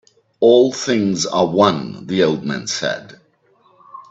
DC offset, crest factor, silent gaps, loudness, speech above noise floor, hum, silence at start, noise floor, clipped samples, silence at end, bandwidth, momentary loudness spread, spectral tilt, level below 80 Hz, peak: under 0.1%; 18 dB; none; -17 LUFS; 40 dB; none; 0.4 s; -57 dBFS; under 0.1%; 0.1 s; 8 kHz; 10 LU; -4.5 dB/octave; -60 dBFS; 0 dBFS